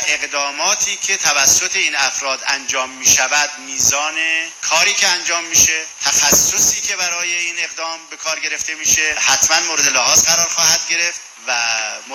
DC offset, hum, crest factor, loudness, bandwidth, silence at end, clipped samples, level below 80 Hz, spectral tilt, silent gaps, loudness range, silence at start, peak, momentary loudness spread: under 0.1%; none; 16 dB; -14 LUFS; 17 kHz; 0 s; under 0.1%; -50 dBFS; 1 dB/octave; none; 2 LU; 0 s; 0 dBFS; 9 LU